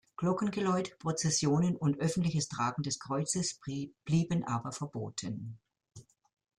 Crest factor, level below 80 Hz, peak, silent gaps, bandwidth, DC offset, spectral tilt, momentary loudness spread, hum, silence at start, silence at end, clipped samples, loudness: 16 dB; -66 dBFS; -18 dBFS; none; 11.5 kHz; under 0.1%; -5 dB/octave; 10 LU; none; 0.2 s; 0.55 s; under 0.1%; -33 LUFS